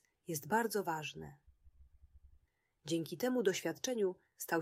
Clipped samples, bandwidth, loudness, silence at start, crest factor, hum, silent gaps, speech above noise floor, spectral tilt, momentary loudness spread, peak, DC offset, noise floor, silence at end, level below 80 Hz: under 0.1%; 16 kHz; -38 LUFS; 0.3 s; 20 dB; none; none; 37 dB; -4 dB/octave; 13 LU; -20 dBFS; under 0.1%; -74 dBFS; 0 s; -70 dBFS